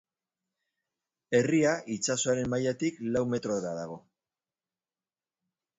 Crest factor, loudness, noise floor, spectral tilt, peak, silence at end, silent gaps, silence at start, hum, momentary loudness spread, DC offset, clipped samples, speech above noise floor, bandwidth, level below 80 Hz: 20 dB; -29 LUFS; under -90 dBFS; -4.5 dB/octave; -12 dBFS; 1.8 s; none; 1.3 s; none; 11 LU; under 0.1%; under 0.1%; over 61 dB; 8 kHz; -64 dBFS